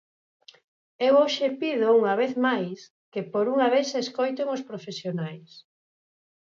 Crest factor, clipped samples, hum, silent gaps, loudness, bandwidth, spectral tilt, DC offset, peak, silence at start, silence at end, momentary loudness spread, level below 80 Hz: 16 dB; under 0.1%; none; 2.90-3.12 s; -25 LUFS; 7.6 kHz; -5 dB/octave; under 0.1%; -10 dBFS; 1 s; 0.95 s; 15 LU; -80 dBFS